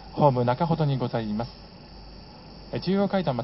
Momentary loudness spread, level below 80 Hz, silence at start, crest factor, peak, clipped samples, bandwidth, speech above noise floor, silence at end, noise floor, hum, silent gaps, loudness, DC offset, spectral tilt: 23 LU; -50 dBFS; 0 s; 22 dB; -4 dBFS; under 0.1%; 5.8 kHz; 20 dB; 0 s; -45 dBFS; none; none; -25 LUFS; under 0.1%; -11.5 dB/octave